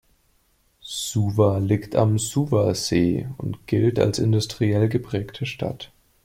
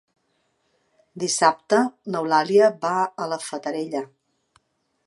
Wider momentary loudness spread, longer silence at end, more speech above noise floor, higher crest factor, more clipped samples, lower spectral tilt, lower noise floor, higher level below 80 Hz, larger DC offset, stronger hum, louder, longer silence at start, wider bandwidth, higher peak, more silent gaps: about the same, 11 LU vs 12 LU; second, 0.4 s vs 1 s; second, 42 dB vs 48 dB; about the same, 18 dB vs 20 dB; neither; first, -6 dB/octave vs -3.5 dB/octave; second, -64 dBFS vs -70 dBFS; first, -52 dBFS vs -78 dBFS; neither; neither; about the same, -23 LUFS vs -22 LUFS; second, 0.85 s vs 1.15 s; first, 16 kHz vs 11.5 kHz; about the same, -4 dBFS vs -2 dBFS; neither